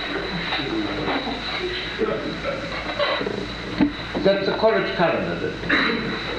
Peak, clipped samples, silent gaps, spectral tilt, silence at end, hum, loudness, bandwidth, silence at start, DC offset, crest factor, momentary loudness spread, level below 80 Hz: -6 dBFS; under 0.1%; none; -5.5 dB/octave; 0 s; none; -23 LUFS; 10.5 kHz; 0 s; under 0.1%; 18 dB; 7 LU; -42 dBFS